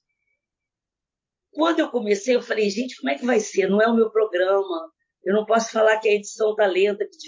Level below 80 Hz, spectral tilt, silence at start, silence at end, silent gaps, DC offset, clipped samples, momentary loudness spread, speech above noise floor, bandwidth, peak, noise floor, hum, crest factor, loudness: -84 dBFS; -4 dB/octave; 1.55 s; 0 s; none; under 0.1%; under 0.1%; 7 LU; 67 dB; 7.6 kHz; -6 dBFS; -88 dBFS; none; 16 dB; -21 LUFS